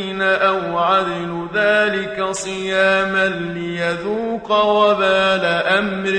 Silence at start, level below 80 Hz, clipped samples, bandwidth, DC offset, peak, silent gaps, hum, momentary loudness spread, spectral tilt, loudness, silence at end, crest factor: 0 s; -52 dBFS; under 0.1%; 10 kHz; under 0.1%; -2 dBFS; none; none; 8 LU; -4 dB/octave; -17 LUFS; 0 s; 16 dB